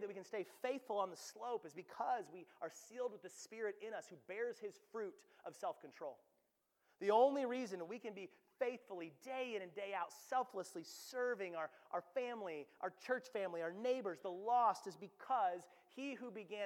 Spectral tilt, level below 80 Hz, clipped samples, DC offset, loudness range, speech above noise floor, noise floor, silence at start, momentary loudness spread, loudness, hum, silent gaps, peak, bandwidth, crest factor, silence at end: -4 dB/octave; under -90 dBFS; under 0.1%; under 0.1%; 7 LU; 40 dB; -83 dBFS; 0 s; 14 LU; -44 LUFS; none; none; -22 dBFS; 17 kHz; 22 dB; 0 s